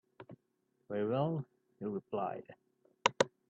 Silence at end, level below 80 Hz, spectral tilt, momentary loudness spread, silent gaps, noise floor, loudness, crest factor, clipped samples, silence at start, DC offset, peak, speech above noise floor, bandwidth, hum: 0.2 s; -80 dBFS; -5 dB/octave; 22 LU; none; -79 dBFS; -37 LUFS; 28 dB; under 0.1%; 0.2 s; under 0.1%; -10 dBFS; 43 dB; 9.2 kHz; none